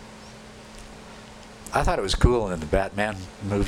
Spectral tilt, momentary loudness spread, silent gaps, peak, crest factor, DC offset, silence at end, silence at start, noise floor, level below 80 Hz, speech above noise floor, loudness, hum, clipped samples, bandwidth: -5.5 dB/octave; 22 LU; none; -6 dBFS; 20 dB; under 0.1%; 0 s; 0 s; -44 dBFS; -32 dBFS; 20 dB; -25 LUFS; none; under 0.1%; 16 kHz